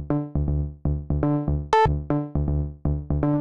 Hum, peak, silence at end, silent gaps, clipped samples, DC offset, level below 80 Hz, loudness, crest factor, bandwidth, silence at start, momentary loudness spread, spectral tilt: none; -8 dBFS; 0 s; none; under 0.1%; 0.3%; -30 dBFS; -25 LUFS; 16 dB; 7.4 kHz; 0 s; 7 LU; -8.5 dB/octave